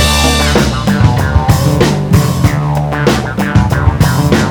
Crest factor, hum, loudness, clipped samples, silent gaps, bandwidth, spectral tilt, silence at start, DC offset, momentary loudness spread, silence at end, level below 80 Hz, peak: 10 dB; none; -11 LUFS; 0.4%; none; over 20 kHz; -5.5 dB/octave; 0 s; under 0.1%; 3 LU; 0 s; -20 dBFS; 0 dBFS